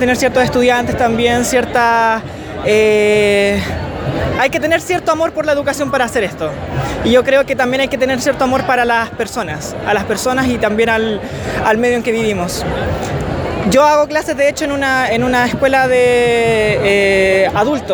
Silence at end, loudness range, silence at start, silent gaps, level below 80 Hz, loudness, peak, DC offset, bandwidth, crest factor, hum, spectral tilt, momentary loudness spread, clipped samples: 0 s; 3 LU; 0 s; none; -34 dBFS; -14 LUFS; 0 dBFS; under 0.1%; over 20 kHz; 14 dB; none; -4.5 dB/octave; 9 LU; under 0.1%